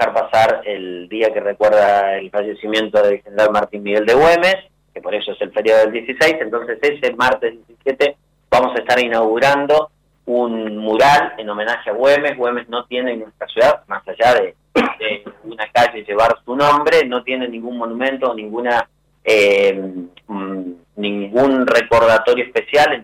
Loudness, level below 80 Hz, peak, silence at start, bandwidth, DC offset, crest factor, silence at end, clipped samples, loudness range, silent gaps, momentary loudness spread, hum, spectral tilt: -16 LUFS; -52 dBFS; -6 dBFS; 0 s; 16 kHz; under 0.1%; 10 dB; 0 s; under 0.1%; 2 LU; none; 13 LU; none; -4.5 dB/octave